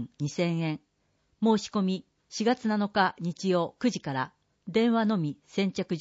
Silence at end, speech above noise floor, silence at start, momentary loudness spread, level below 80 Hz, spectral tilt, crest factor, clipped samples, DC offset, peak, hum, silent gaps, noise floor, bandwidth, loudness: 0 s; 44 dB; 0 s; 8 LU; -70 dBFS; -6 dB/octave; 16 dB; under 0.1%; under 0.1%; -12 dBFS; none; none; -72 dBFS; 8 kHz; -29 LUFS